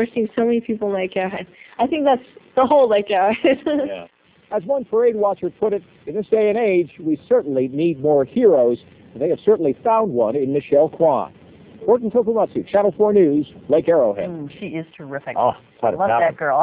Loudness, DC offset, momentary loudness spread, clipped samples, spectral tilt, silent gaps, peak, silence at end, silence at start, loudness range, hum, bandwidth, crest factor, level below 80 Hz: -19 LUFS; under 0.1%; 12 LU; under 0.1%; -10.5 dB/octave; none; -4 dBFS; 0 s; 0 s; 2 LU; none; 4 kHz; 16 dB; -58 dBFS